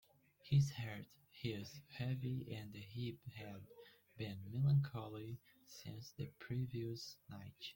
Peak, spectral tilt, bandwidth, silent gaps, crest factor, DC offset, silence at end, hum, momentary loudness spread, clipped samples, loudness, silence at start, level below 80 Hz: -24 dBFS; -6.5 dB/octave; 17 kHz; none; 18 dB; under 0.1%; 0.05 s; none; 19 LU; under 0.1%; -44 LUFS; 0.45 s; -72 dBFS